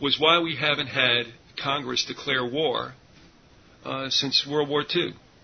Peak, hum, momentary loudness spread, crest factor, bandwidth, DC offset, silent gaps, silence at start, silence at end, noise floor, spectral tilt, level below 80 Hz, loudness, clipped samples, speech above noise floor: -4 dBFS; none; 12 LU; 22 dB; 6.6 kHz; under 0.1%; none; 0 s; 0.25 s; -54 dBFS; -3.5 dB/octave; -62 dBFS; -24 LUFS; under 0.1%; 29 dB